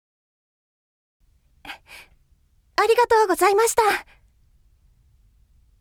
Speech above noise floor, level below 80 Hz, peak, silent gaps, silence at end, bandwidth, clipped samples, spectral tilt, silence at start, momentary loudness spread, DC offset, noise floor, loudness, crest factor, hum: 42 dB; -56 dBFS; -4 dBFS; none; 1.8 s; 18 kHz; under 0.1%; -1.5 dB/octave; 1.65 s; 23 LU; under 0.1%; -60 dBFS; -19 LUFS; 20 dB; none